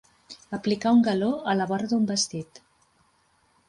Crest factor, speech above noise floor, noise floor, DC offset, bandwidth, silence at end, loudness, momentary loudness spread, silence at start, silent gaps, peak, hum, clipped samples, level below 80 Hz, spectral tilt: 14 dB; 41 dB; -65 dBFS; under 0.1%; 11.5 kHz; 1.25 s; -24 LUFS; 21 LU; 0.3 s; none; -12 dBFS; none; under 0.1%; -66 dBFS; -4.5 dB/octave